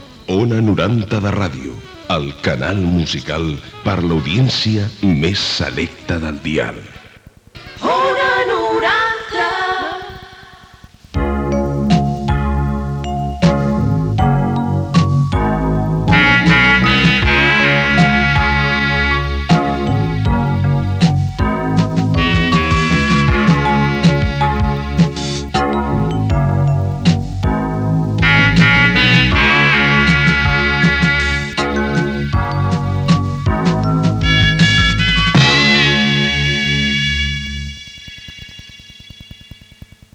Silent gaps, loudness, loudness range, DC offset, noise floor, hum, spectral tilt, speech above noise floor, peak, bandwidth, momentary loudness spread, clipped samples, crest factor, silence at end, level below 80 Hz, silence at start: none; -14 LUFS; 8 LU; under 0.1%; -43 dBFS; none; -5.5 dB/octave; 26 dB; 0 dBFS; 9.6 kHz; 11 LU; under 0.1%; 14 dB; 0.9 s; -26 dBFS; 0 s